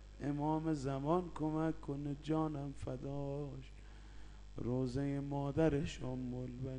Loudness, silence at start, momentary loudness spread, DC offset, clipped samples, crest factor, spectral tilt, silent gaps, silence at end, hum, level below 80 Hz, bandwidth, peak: -39 LUFS; 0 s; 18 LU; under 0.1%; under 0.1%; 18 dB; -8 dB/octave; none; 0 s; 50 Hz at -55 dBFS; -54 dBFS; 9.8 kHz; -20 dBFS